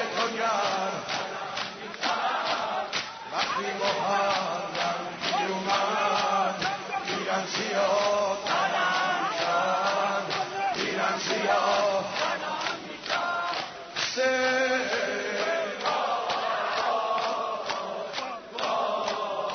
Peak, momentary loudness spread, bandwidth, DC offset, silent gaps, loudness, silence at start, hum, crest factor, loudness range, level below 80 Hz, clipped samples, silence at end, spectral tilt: -12 dBFS; 7 LU; 6.6 kHz; under 0.1%; none; -27 LUFS; 0 s; none; 16 dB; 3 LU; -70 dBFS; under 0.1%; 0 s; -2.5 dB/octave